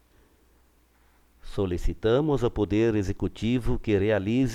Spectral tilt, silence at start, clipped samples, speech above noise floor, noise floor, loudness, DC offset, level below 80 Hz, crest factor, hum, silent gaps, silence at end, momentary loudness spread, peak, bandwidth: -7.5 dB/octave; 1.45 s; under 0.1%; 37 dB; -61 dBFS; -26 LUFS; under 0.1%; -36 dBFS; 14 dB; none; none; 0 s; 6 LU; -12 dBFS; 13.5 kHz